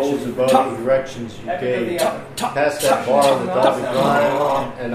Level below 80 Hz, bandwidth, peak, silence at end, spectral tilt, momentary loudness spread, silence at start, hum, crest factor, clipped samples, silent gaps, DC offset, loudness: -50 dBFS; 15.5 kHz; -2 dBFS; 0 s; -4.5 dB/octave; 8 LU; 0 s; none; 16 dB; under 0.1%; none; under 0.1%; -18 LUFS